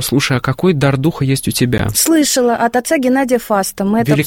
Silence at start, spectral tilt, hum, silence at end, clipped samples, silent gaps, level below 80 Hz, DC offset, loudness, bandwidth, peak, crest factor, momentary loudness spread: 0 s; -4.5 dB/octave; none; 0 s; under 0.1%; none; -38 dBFS; under 0.1%; -14 LUFS; 17 kHz; 0 dBFS; 14 dB; 4 LU